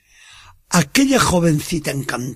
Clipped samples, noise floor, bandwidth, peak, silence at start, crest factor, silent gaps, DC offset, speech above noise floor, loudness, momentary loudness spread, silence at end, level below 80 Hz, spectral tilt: under 0.1%; -45 dBFS; 15.5 kHz; -2 dBFS; 0.7 s; 16 dB; none; under 0.1%; 29 dB; -17 LUFS; 8 LU; 0 s; -40 dBFS; -4.5 dB/octave